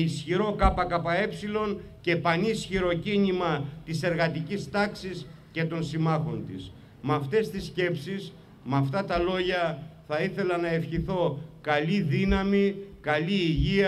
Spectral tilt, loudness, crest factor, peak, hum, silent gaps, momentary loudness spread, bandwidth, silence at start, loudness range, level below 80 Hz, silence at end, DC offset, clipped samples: -6.5 dB/octave; -28 LUFS; 20 dB; -6 dBFS; none; none; 11 LU; 13 kHz; 0 s; 3 LU; -42 dBFS; 0 s; under 0.1%; under 0.1%